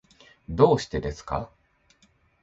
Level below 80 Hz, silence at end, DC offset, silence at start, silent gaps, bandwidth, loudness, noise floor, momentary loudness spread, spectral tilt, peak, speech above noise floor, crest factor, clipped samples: -44 dBFS; 0.95 s; under 0.1%; 0.5 s; none; 8 kHz; -25 LUFS; -64 dBFS; 15 LU; -6.5 dB/octave; -4 dBFS; 40 dB; 24 dB; under 0.1%